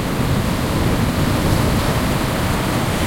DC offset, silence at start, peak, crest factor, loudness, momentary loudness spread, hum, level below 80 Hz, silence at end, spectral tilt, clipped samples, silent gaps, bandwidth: under 0.1%; 0 s; -4 dBFS; 14 dB; -18 LUFS; 2 LU; none; -28 dBFS; 0 s; -5.5 dB/octave; under 0.1%; none; 16.5 kHz